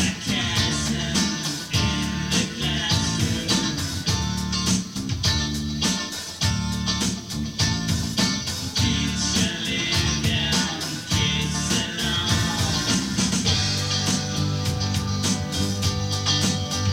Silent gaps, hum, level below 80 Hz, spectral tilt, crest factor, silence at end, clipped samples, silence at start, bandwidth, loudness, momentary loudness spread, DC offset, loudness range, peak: none; none; -38 dBFS; -3.5 dB/octave; 16 dB; 0 s; under 0.1%; 0 s; 16.5 kHz; -23 LUFS; 4 LU; under 0.1%; 2 LU; -8 dBFS